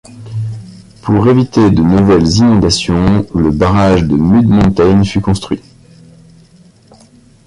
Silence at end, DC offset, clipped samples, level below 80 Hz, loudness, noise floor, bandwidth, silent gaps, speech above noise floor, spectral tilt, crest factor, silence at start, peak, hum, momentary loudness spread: 1.9 s; under 0.1%; under 0.1%; -28 dBFS; -10 LUFS; -43 dBFS; 11.5 kHz; none; 34 dB; -7 dB/octave; 12 dB; 0.15 s; 0 dBFS; none; 13 LU